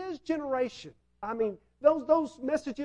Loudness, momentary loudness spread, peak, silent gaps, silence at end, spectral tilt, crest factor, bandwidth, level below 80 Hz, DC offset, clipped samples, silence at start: -30 LUFS; 11 LU; -10 dBFS; none; 0 s; -5.5 dB/octave; 22 dB; 10.5 kHz; -66 dBFS; under 0.1%; under 0.1%; 0 s